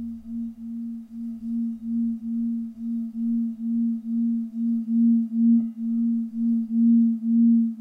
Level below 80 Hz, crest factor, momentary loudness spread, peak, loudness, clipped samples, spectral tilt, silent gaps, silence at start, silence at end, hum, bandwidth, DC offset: -62 dBFS; 10 dB; 14 LU; -12 dBFS; -24 LUFS; under 0.1%; -11 dB/octave; none; 0 s; 0 s; none; 0.7 kHz; under 0.1%